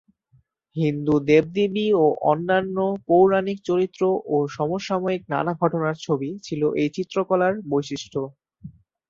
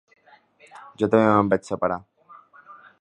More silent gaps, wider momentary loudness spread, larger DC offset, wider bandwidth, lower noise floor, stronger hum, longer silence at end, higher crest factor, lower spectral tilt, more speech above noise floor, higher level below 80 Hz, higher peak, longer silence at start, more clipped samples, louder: neither; about the same, 8 LU vs 10 LU; neither; second, 7.6 kHz vs 10 kHz; first, -62 dBFS vs -55 dBFS; neither; about the same, 0.4 s vs 0.3 s; about the same, 18 dB vs 22 dB; about the same, -7 dB/octave vs -7.5 dB/octave; first, 40 dB vs 34 dB; about the same, -60 dBFS vs -58 dBFS; about the same, -4 dBFS vs -2 dBFS; second, 0.75 s vs 1 s; neither; about the same, -22 LUFS vs -22 LUFS